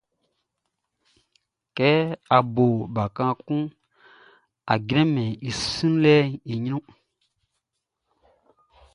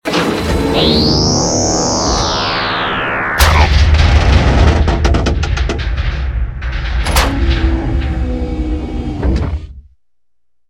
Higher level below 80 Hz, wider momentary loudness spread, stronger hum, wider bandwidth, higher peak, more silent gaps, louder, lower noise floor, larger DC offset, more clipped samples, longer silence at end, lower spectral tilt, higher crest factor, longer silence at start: second, -56 dBFS vs -16 dBFS; about the same, 11 LU vs 10 LU; neither; second, 11 kHz vs 17 kHz; about the same, -2 dBFS vs 0 dBFS; neither; second, -23 LUFS vs -14 LUFS; first, -81 dBFS vs -77 dBFS; second, under 0.1% vs 0.1%; neither; first, 2.15 s vs 0.9 s; first, -6.5 dB/octave vs -4.5 dB/octave; first, 22 dB vs 12 dB; first, 1.75 s vs 0.05 s